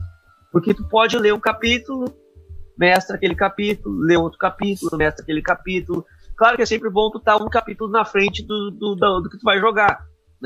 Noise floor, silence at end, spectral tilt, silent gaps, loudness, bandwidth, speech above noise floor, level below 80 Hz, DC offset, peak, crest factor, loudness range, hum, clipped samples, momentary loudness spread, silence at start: -41 dBFS; 0 s; -5 dB/octave; none; -19 LUFS; 15.5 kHz; 22 dB; -40 dBFS; under 0.1%; -2 dBFS; 18 dB; 1 LU; none; under 0.1%; 9 LU; 0 s